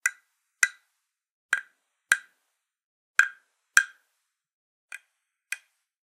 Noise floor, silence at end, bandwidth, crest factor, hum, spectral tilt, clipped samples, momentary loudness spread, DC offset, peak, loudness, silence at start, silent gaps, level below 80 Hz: -80 dBFS; 0.5 s; 16 kHz; 32 dB; none; 4.5 dB/octave; under 0.1%; 22 LU; under 0.1%; 0 dBFS; -27 LUFS; 0.05 s; 1.31-1.49 s, 2.84-3.14 s, 4.53-4.89 s; under -90 dBFS